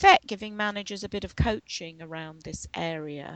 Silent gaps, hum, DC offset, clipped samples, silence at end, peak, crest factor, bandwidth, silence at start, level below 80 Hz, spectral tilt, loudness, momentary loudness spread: none; none; under 0.1%; under 0.1%; 0 s; -2 dBFS; 24 dB; 9 kHz; 0 s; -44 dBFS; -4 dB/octave; -29 LUFS; 14 LU